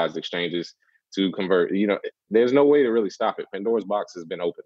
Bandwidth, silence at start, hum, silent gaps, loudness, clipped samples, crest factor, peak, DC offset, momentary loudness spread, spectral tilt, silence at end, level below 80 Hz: 7.4 kHz; 0 s; none; none; -23 LUFS; under 0.1%; 16 dB; -6 dBFS; under 0.1%; 12 LU; -6 dB/octave; 0.05 s; -72 dBFS